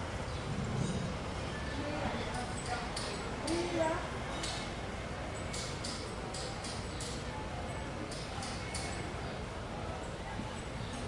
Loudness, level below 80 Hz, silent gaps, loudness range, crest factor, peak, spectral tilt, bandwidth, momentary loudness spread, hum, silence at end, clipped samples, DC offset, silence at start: -39 LUFS; -48 dBFS; none; 3 LU; 18 dB; -20 dBFS; -4.5 dB/octave; 11.5 kHz; 5 LU; none; 0 s; under 0.1%; under 0.1%; 0 s